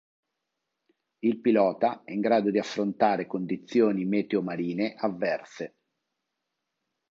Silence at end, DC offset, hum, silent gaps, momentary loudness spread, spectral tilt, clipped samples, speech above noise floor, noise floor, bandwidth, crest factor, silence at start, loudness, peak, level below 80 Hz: 1.5 s; under 0.1%; none; none; 8 LU; -7 dB/octave; under 0.1%; 57 dB; -83 dBFS; 7.6 kHz; 20 dB; 1.25 s; -27 LUFS; -8 dBFS; -74 dBFS